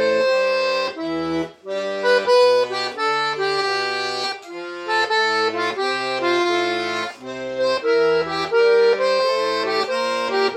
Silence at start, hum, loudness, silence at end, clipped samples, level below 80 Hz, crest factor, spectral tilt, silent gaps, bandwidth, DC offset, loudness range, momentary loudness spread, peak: 0 s; none; -20 LUFS; 0 s; under 0.1%; -62 dBFS; 14 dB; -3 dB/octave; none; 12 kHz; under 0.1%; 2 LU; 10 LU; -6 dBFS